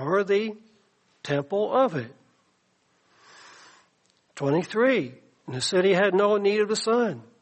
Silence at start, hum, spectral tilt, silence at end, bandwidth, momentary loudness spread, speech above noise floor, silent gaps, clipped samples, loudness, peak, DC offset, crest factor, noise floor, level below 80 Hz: 0 s; none; -5 dB/octave; 0.2 s; 8.4 kHz; 15 LU; 44 dB; none; under 0.1%; -24 LUFS; -10 dBFS; under 0.1%; 16 dB; -68 dBFS; -74 dBFS